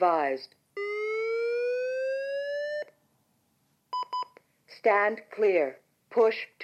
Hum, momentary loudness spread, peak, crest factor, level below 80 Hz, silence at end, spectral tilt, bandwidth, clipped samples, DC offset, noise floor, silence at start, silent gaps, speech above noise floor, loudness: none; 12 LU; -10 dBFS; 18 dB; under -90 dBFS; 0 s; -4.5 dB/octave; 9 kHz; under 0.1%; under 0.1%; -71 dBFS; 0 s; none; 45 dB; -29 LUFS